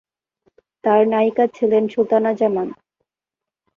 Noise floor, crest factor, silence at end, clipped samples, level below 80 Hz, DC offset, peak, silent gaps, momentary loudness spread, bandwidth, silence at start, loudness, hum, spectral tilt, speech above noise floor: -87 dBFS; 16 dB; 1.05 s; under 0.1%; -66 dBFS; under 0.1%; -4 dBFS; none; 9 LU; 6.8 kHz; 0.85 s; -18 LUFS; none; -8 dB/octave; 70 dB